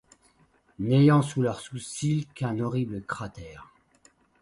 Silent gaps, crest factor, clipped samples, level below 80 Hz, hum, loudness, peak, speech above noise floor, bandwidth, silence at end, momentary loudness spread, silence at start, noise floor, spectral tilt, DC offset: none; 18 dB; under 0.1%; -58 dBFS; none; -26 LUFS; -8 dBFS; 38 dB; 11.5 kHz; 0.75 s; 17 LU; 0.8 s; -64 dBFS; -7 dB/octave; under 0.1%